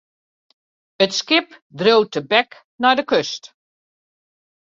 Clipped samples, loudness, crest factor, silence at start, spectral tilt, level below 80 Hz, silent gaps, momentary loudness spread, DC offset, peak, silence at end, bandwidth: under 0.1%; -18 LUFS; 20 dB; 1 s; -3.5 dB/octave; -68 dBFS; 1.62-1.70 s, 2.64-2.78 s; 13 LU; under 0.1%; -2 dBFS; 1.3 s; 7.6 kHz